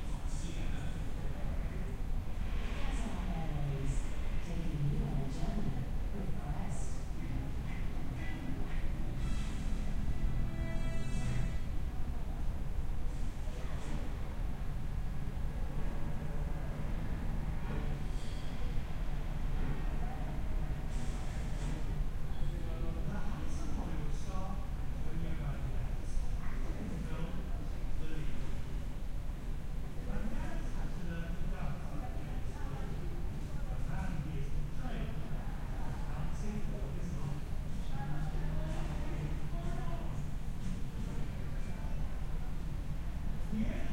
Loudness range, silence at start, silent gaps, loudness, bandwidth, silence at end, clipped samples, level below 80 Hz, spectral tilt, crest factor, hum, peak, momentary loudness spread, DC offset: 3 LU; 0 s; none; -41 LUFS; 10.5 kHz; 0 s; under 0.1%; -36 dBFS; -6.5 dB/octave; 12 dB; none; -20 dBFS; 4 LU; under 0.1%